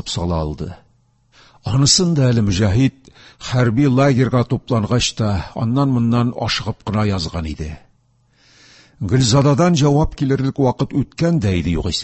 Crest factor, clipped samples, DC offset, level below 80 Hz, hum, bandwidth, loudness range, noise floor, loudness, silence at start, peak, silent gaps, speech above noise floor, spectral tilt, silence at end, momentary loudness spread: 18 dB; under 0.1%; under 0.1%; -34 dBFS; none; 8.6 kHz; 5 LU; -58 dBFS; -17 LUFS; 0.05 s; 0 dBFS; none; 42 dB; -5.5 dB/octave; 0 s; 11 LU